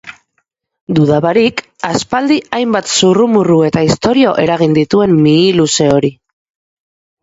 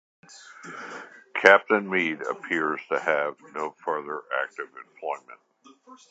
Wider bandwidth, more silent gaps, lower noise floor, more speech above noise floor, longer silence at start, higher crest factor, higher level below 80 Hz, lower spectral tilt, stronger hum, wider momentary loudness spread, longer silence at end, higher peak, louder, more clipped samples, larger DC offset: about the same, 8 kHz vs 8.6 kHz; first, 0.81-0.87 s vs none; first, -65 dBFS vs -52 dBFS; first, 55 dB vs 26 dB; second, 0.05 s vs 0.3 s; second, 12 dB vs 26 dB; first, -46 dBFS vs -78 dBFS; about the same, -5 dB/octave vs -4 dB/octave; neither; second, 6 LU vs 22 LU; first, 1.1 s vs 0.15 s; about the same, 0 dBFS vs 0 dBFS; first, -11 LUFS vs -25 LUFS; neither; neither